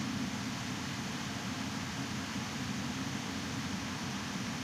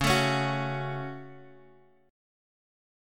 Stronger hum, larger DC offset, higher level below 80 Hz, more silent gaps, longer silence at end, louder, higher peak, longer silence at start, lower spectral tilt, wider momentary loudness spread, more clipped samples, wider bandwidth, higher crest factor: neither; neither; second, -62 dBFS vs -50 dBFS; neither; second, 0 s vs 1 s; second, -38 LUFS vs -29 LUFS; second, -24 dBFS vs -10 dBFS; about the same, 0 s vs 0 s; about the same, -4 dB/octave vs -4.5 dB/octave; second, 1 LU vs 20 LU; neither; about the same, 16 kHz vs 17.5 kHz; second, 14 dB vs 22 dB